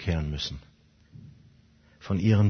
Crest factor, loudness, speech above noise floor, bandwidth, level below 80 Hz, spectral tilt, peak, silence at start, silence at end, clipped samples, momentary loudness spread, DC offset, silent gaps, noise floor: 18 dB; -29 LUFS; 34 dB; 6.6 kHz; -44 dBFS; -7 dB/octave; -10 dBFS; 0 s; 0 s; under 0.1%; 24 LU; under 0.1%; none; -59 dBFS